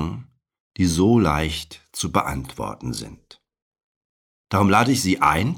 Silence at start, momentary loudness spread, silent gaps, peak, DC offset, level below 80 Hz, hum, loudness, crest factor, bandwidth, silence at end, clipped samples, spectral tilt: 0 s; 15 LU; 0.60-0.71 s, 3.62-3.71 s, 3.83-4.45 s; -4 dBFS; under 0.1%; -40 dBFS; none; -21 LUFS; 18 dB; 18 kHz; 0 s; under 0.1%; -5 dB/octave